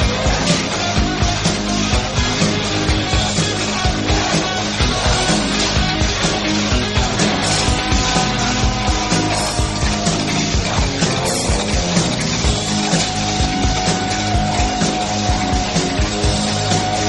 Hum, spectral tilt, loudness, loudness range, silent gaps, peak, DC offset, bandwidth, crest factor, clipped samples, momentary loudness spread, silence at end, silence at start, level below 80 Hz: none; -3.5 dB/octave; -17 LUFS; 1 LU; none; 0 dBFS; under 0.1%; 11 kHz; 16 dB; under 0.1%; 2 LU; 0 s; 0 s; -26 dBFS